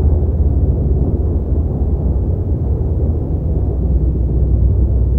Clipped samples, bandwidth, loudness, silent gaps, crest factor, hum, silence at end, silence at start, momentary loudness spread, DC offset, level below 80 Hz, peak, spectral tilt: under 0.1%; 1.5 kHz; -17 LUFS; none; 12 dB; none; 0 s; 0 s; 3 LU; under 0.1%; -16 dBFS; -2 dBFS; -13.5 dB/octave